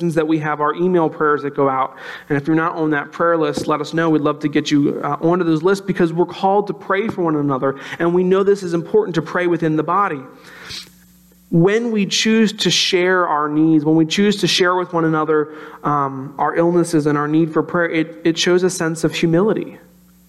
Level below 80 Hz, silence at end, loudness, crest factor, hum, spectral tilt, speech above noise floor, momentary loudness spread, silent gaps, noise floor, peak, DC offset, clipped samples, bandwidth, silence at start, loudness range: -58 dBFS; 0.5 s; -17 LUFS; 12 dB; none; -5 dB/octave; 32 dB; 6 LU; none; -49 dBFS; -4 dBFS; under 0.1%; under 0.1%; 13 kHz; 0 s; 3 LU